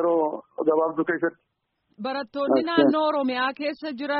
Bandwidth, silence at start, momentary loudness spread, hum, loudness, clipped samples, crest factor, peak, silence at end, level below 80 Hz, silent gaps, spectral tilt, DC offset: 5.8 kHz; 0 s; 10 LU; none; -24 LUFS; under 0.1%; 20 dB; -6 dBFS; 0 s; -70 dBFS; none; -2.5 dB/octave; under 0.1%